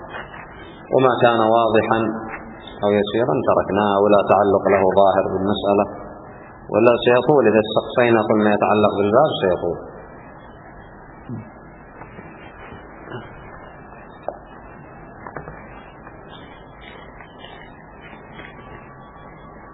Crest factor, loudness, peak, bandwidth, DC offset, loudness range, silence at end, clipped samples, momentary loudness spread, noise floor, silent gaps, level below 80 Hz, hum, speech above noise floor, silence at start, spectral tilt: 20 dB; -17 LUFS; 0 dBFS; 4.1 kHz; under 0.1%; 22 LU; 0 s; under 0.1%; 25 LU; -41 dBFS; none; -50 dBFS; none; 25 dB; 0 s; -10 dB/octave